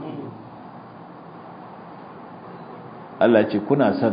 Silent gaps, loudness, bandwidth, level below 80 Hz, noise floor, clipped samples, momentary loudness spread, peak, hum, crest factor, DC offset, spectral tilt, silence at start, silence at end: none; -19 LUFS; 5.2 kHz; -64 dBFS; -41 dBFS; under 0.1%; 23 LU; -2 dBFS; none; 22 dB; under 0.1%; -11.5 dB/octave; 0 s; 0 s